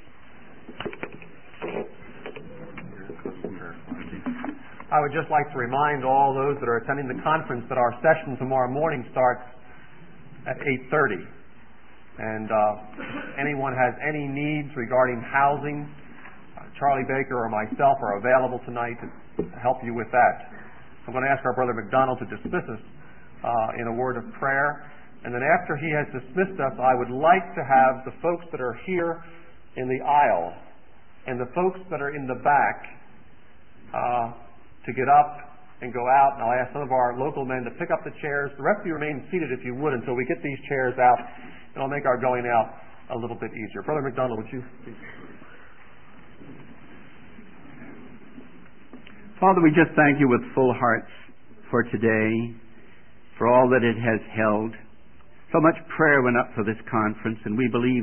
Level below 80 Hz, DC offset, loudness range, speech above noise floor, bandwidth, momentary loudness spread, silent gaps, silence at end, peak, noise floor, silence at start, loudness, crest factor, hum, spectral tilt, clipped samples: -58 dBFS; 0.9%; 6 LU; 31 dB; 3.3 kHz; 18 LU; none; 0 s; -4 dBFS; -55 dBFS; 0.7 s; -24 LUFS; 20 dB; none; -11 dB/octave; under 0.1%